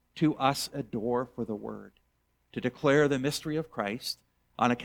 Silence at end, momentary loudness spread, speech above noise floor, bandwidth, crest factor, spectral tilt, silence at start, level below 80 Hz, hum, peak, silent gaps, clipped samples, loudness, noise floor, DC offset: 0 s; 16 LU; 44 dB; 19.5 kHz; 22 dB; -5 dB/octave; 0.15 s; -62 dBFS; none; -10 dBFS; none; under 0.1%; -30 LUFS; -73 dBFS; under 0.1%